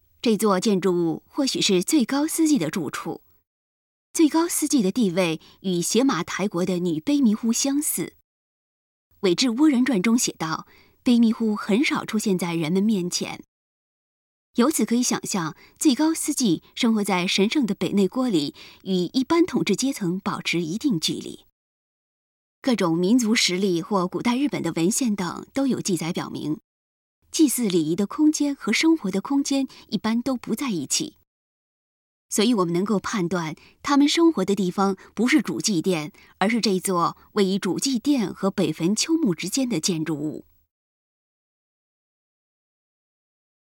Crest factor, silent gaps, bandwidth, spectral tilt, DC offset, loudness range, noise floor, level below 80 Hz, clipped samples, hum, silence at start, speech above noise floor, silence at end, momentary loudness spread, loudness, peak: 18 dB; 3.47-4.14 s, 8.24-9.11 s, 13.48-14.54 s, 21.52-22.62 s, 26.64-27.22 s, 31.27-32.29 s; 17.5 kHz; -4 dB/octave; under 0.1%; 4 LU; under -90 dBFS; -64 dBFS; under 0.1%; none; 0.25 s; over 68 dB; 3.2 s; 9 LU; -23 LUFS; -6 dBFS